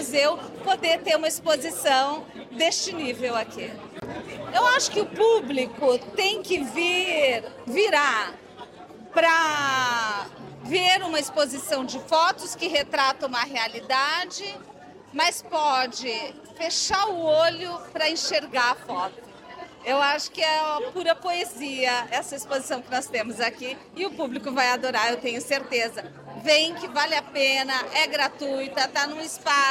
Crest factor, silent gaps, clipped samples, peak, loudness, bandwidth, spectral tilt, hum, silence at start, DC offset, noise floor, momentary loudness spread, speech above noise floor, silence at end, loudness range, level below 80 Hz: 18 dB; none; under 0.1%; -8 dBFS; -24 LUFS; 16.5 kHz; -1.5 dB/octave; none; 0 s; under 0.1%; -44 dBFS; 13 LU; 20 dB; 0 s; 3 LU; -64 dBFS